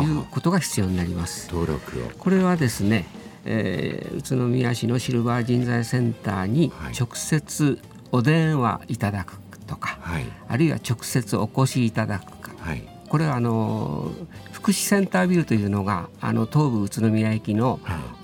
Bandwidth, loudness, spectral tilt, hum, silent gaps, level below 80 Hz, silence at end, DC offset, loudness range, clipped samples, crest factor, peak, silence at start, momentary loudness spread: 19 kHz; -24 LUFS; -6 dB/octave; none; none; -50 dBFS; 0 s; under 0.1%; 3 LU; under 0.1%; 16 dB; -8 dBFS; 0 s; 12 LU